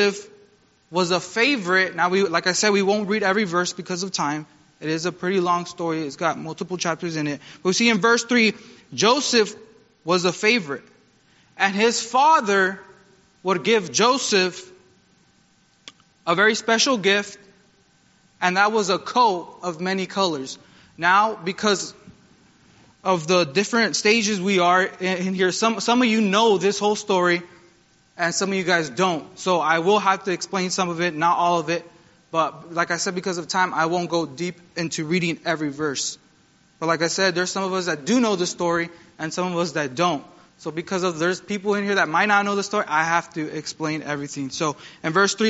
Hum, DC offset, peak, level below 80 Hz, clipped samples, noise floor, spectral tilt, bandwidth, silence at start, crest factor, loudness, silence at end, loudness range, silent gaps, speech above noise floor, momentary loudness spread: none; under 0.1%; -2 dBFS; -68 dBFS; under 0.1%; -60 dBFS; -2.5 dB/octave; 8 kHz; 0 s; 20 dB; -21 LUFS; 0 s; 4 LU; none; 38 dB; 11 LU